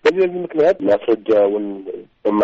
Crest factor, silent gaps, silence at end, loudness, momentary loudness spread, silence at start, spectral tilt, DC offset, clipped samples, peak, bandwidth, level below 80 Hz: 12 dB; none; 0 s; -18 LUFS; 12 LU; 0.05 s; -4.5 dB/octave; under 0.1%; under 0.1%; -4 dBFS; 7.8 kHz; -60 dBFS